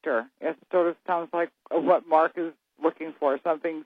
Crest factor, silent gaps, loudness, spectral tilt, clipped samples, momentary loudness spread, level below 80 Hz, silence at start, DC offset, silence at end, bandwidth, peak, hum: 20 dB; none; -27 LUFS; -8 dB/octave; under 0.1%; 9 LU; -88 dBFS; 0.05 s; under 0.1%; 0.05 s; 5 kHz; -8 dBFS; none